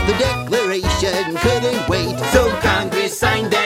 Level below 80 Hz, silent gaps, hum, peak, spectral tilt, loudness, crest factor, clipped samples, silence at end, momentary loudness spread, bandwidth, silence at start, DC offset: -30 dBFS; none; none; 0 dBFS; -4 dB/octave; -17 LUFS; 16 dB; under 0.1%; 0 s; 3 LU; 16 kHz; 0 s; under 0.1%